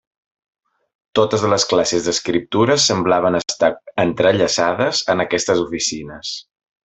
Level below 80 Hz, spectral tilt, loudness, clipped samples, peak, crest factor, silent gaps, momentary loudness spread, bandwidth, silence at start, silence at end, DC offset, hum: -54 dBFS; -3.5 dB/octave; -17 LUFS; under 0.1%; -2 dBFS; 16 dB; none; 8 LU; 8.4 kHz; 1.15 s; 0.45 s; under 0.1%; none